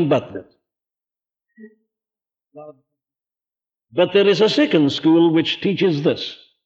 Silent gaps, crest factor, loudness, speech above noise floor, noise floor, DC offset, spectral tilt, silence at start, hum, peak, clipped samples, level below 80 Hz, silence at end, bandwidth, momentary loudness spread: none; 16 dB; -17 LUFS; over 73 dB; under -90 dBFS; under 0.1%; -6.5 dB/octave; 0 s; none; -4 dBFS; under 0.1%; -66 dBFS; 0.3 s; 7.8 kHz; 13 LU